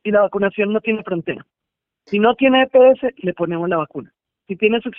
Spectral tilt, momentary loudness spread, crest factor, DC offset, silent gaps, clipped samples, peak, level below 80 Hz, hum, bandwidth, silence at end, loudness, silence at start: -4 dB/octave; 16 LU; 16 dB; under 0.1%; none; under 0.1%; -2 dBFS; -58 dBFS; none; 4.9 kHz; 0.1 s; -17 LUFS; 0.05 s